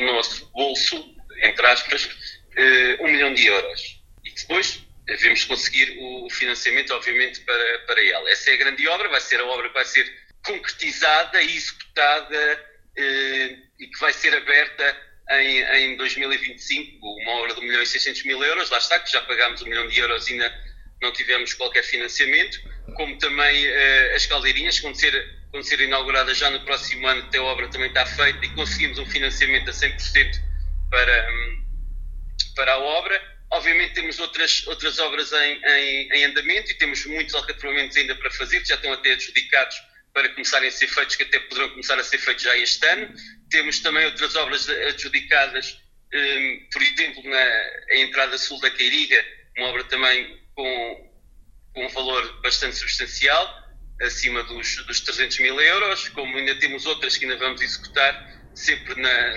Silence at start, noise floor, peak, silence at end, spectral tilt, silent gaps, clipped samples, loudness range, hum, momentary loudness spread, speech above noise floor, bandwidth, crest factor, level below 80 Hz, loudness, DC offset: 0 s; -49 dBFS; 0 dBFS; 0 s; -1 dB/octave; none; under 0.1%; 3 LU; none; 11 LU; 27 dB; 9 kHz; 22 dB; -38 dBFS; -19 LUFS; under 0.1%